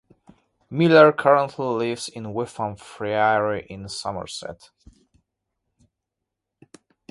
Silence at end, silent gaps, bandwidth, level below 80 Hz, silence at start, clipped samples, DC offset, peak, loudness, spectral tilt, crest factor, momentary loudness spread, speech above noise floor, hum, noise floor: 2.55 s; none; 11.5 kHz; -58 dBFS; 0.7 s; under 0.1%; under 0.1%; 0 dBFS; -21 LUFS; -5.5 dB/octave; 22 dB; 18 LU; 62 dB; none; -83 dBFS